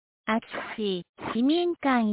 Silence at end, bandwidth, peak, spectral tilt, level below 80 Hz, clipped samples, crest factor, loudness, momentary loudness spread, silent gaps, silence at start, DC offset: 0 s; 4 kHz; -12 dBFS; -3.5 dB/octave; -64 dBFS; under 0.1%; 14 dB; -28 LUFS; 9 LU; 1.09-1.14 s; 0.25 s; under 0.1%